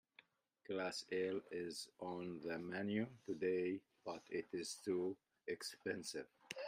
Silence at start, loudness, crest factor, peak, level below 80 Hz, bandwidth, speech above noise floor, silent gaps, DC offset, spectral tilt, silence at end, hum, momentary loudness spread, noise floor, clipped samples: 0.7 s; -45 LUFS; 18 dB; -28 dBFS; -86 dBFS; 15.5 kHz; 28 dB; none; under 0.1%; -4.5 dB/octave; 0 s; none; 8 LU; -72 dBFS; under 0.1%